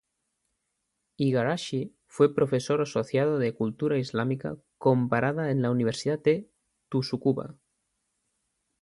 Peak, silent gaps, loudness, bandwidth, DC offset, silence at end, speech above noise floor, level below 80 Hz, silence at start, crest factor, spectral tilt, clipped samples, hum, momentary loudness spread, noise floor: -10 dBFS; none; -27 LUFS; 11.5 kHz; under 0.1%; 1.3 s; 54 dB; -66 dBFS; 1.2 s; 18 dB; -7 dB/octave; under 0.1%; none; 8 LU; -80 dBFS